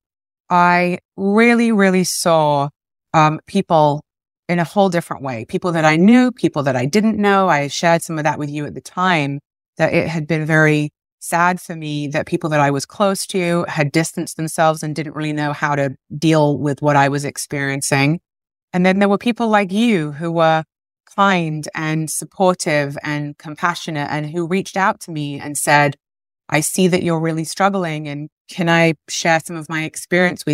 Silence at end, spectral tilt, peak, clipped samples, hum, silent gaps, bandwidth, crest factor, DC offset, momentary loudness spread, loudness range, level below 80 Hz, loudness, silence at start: 0 s; -5 dB/octave; 0 dBFS; under 0.1%; none; 1.05-1.09 s, 4.39-4.43 s, 9.68-9.73 s, 11.12-11.18 s, 18.63-18.68 s, 28.32-28.45 s; 16 kHz; 16 dB; under 0.1%; 11 LU; 4 LU; -60 dBFS; -17 LUFS; 0.5 s